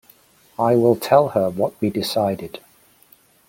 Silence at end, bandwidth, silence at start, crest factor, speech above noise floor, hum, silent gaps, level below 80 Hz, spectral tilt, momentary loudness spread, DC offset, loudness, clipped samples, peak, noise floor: 0.9 s; 17 kHz; 0.6 s; 18 dB; 36 dB; none; none; -60 dBFS; -6 dB/octave; 18 LU; under 0.1%; -19 LUFS; under 0.1%; -2 dBFS; -54 dBFS